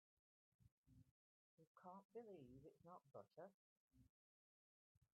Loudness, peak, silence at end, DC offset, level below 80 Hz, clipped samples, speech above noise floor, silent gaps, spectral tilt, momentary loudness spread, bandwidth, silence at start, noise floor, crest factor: -64 LUFS; -48 dBFS; 0.1 s; under 0.1%; -90 dBFS; under 0.1%; over 27 dB; 0.72-0.84 s, 1.11-1.58 s, 1.67-1.75 s, 2.05-2.09 s, 3.54-3.88 s, 4.09-5.01 s; -5.5 dB/octave; 6 LU; 3 kHz; 0.6 s; under -90 dBFS; 20 dB